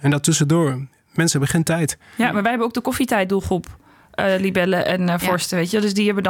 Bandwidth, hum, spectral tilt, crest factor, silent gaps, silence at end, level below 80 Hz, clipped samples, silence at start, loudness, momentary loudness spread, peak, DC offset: 18.5 kHz; none; -5 dB/octave; 14 dB; none; 0 s; -50 dBFS; under 0.1%; 0 s; -19 LUFS; 6 LU; -6 dBFS; under 0.1%